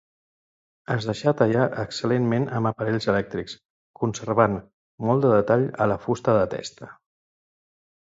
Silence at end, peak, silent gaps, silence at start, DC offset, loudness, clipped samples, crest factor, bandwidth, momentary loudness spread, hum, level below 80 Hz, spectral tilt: 1.25 s; -4 dBFS; 3.65-3.94 s, 4.73-4.98 s; 0.9 s; under 0.1%; -23 LUFS; under 0.1%; 20 dB; 8 kHz; 12 LU; none; -56 dBFS; -6.5 dB/octave